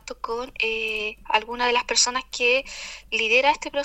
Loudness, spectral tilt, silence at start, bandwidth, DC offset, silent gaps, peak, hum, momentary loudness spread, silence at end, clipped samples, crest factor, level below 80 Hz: -22 LUFS; 0.5 dB/octave; 0.05 s; 15.5 kHz; under 0.1%; none; -6 dBFS; none; 12 LU; 0 s; under 0.1%; 18 dB; -50 dBFS